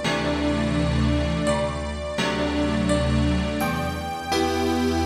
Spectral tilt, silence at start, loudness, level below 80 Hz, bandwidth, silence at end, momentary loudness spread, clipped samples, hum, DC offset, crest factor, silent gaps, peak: -5.5 dB/octave; 0 s; -24 LUFS; -34 dBFS; 13.5 kHz; 0 s; 5 LU; under 0.1%; none; under 0.1%; 14 dB; none; -10 dBFS